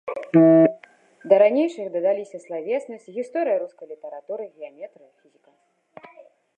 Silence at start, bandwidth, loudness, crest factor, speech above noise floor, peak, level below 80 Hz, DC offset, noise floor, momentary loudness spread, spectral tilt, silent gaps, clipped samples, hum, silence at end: 0.05 s; 8.8 kHz; -20 LUFS; 20 dB; 39 dB; -2 dBFS; -78 dBFS; under 0.1%; -63 dBFS; 23 LU; -8.5 dB/octave; none; under 0.1%; none; 1.7 s